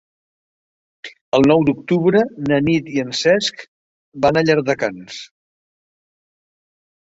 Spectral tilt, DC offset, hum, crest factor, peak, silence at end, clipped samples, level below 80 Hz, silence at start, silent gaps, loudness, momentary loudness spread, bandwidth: -5.5 dB/octave; under 0.1%; none; 18 dB; -2 dBFS; 1.85 s; under 0.1%; -54 dBFS; 1.05 s; 1.21-1.32 s, 3.68-4.12 s; -17 LUFS; 19 LU; 8 kHz